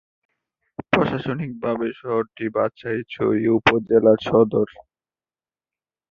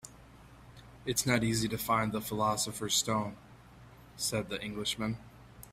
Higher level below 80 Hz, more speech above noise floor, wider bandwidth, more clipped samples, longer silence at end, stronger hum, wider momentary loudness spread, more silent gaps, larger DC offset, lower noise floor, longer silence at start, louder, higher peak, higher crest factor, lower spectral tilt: about the same, -54 dBFS vs -58 dBFS; first, over 70 dB vs 22 dB; second, 6.8 kHz vs 16 kHz; neither; first, 1.3 s vs 0 s; neither; second, 11 LU vs 15 LU; neither; neither; first, under -90 dBFS vs -55 dBFS; first, 0.8 s vs 0.05 s; first, -21 LUFS vs -32 LUFS; first, -2 dBFS vs -14 dBFS; about the same, 20 dB vs 22 dB; first, -7.5 dB/octave vs -3.5 dB/octave